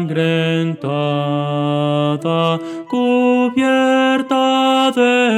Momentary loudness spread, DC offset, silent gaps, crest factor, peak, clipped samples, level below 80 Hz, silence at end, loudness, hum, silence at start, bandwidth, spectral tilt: 6 LU; under 0.1%; none; 14 dB; -2 dBFS; under 0.1%; -68 dBFS; 0 s; -16 LUFS; none; 0 s; 13 kHz; -6 dB/octave